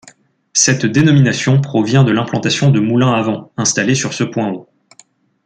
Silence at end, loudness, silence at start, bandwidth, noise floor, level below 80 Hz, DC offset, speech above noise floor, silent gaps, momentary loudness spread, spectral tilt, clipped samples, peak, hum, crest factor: 0.85 s; -14 LUFS; 0.55 s; 9.4 kHz; -50 dBFS; -52 dBFS; under 0.1%; 37 dB; none; 7 LU; -4.5 dB/octave; under 0.1%; 0 dBFS; none; 14 dB